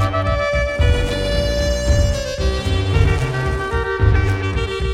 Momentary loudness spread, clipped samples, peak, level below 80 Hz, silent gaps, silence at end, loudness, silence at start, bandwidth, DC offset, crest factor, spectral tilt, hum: 4 LU; under 0.1%; -2 dBFS; -22 dBFS; none; 0 s; -19 LUFS; 0 s; 13.5 kHz; under 0.1%; 16 dB; -5.5 dB/octave; none